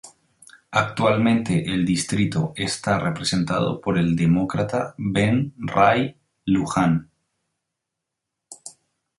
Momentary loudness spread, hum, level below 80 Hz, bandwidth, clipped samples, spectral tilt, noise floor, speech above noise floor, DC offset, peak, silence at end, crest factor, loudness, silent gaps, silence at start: 7 LU; none; -50 dBFS; 11.5 kHz; under 0.1%; -6 dB/octave; -82 dBFS; 62 dB; under 0.1%; -2 dBFS; 0.5 s; 20 dB; -22 LUFS; none; 0.05 s